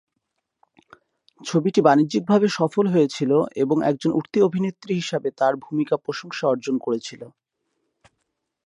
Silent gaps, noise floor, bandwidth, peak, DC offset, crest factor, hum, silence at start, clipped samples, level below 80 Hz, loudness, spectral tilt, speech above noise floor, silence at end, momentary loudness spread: none; -78 dBFS; 11 kHz; -2 dBFS; under 0.1%; 20 dB; none; 1.4 s; under 0.1%; -70 dBFS; -21 LUFS; -6.5 dB/octave; 57 dB; 1.4 s; 9 LU